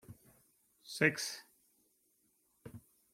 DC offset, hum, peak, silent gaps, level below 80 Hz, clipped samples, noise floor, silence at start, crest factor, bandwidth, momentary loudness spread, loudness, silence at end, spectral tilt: under 0.1%; none; -12 dBFS; none; -78 dBFS; under 0.1%; -76 dBFS; 0.1 s; 30 dB; 16.5 kHz; 26 LU; -35 LUFS; 0.35 s; -3.5 dB/octave